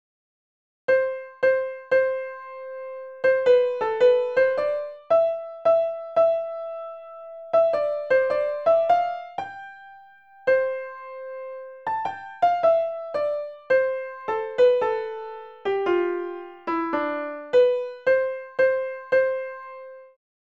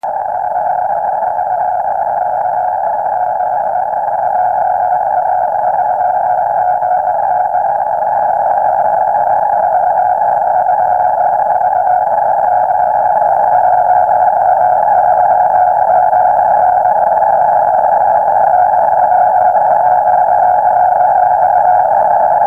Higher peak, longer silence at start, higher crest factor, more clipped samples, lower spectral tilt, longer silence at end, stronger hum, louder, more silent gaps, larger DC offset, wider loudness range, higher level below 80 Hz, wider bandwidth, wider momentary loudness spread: second, -8 dBFS vs 0 dBFS; first, 0.9 s vs 0.05 s; first, 16 dB vs 10 dB; neither; second, -5.5 dB/octave vs -7 dB/octave; first, 0.45 s vs 0 s; neither; second, -23 LUFS vs -11 LUFS; neither; second, under 0.1% vs 0.3%; about the same, 4 LU vs 4 LU; second, -76 dBFS vs -50 dBFS; first, 6.4 kHz vs 2.6 kHz; first, 17 LU vs 5 LU